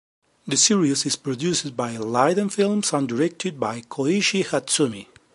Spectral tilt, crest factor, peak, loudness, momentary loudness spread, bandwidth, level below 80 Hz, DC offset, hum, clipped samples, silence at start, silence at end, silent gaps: -3.5 dB/octave; 18 dB; -4 dBFS; -22 LUFS; 10 LU; 11.5 kHz; -66 dBFS; under 0.1%; none; under 0.1%; 0.45 s; 0.3 s; none